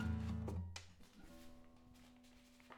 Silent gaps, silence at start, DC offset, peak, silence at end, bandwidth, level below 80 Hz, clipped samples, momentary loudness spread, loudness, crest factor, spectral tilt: none; 0 s; under 0.1%; -32 dBFS; 0 s; 14.5 kHz; -60 dBFS; under 0.1%; 21 LU; -47 LUFS; 16 dB; -6.5 dB/octave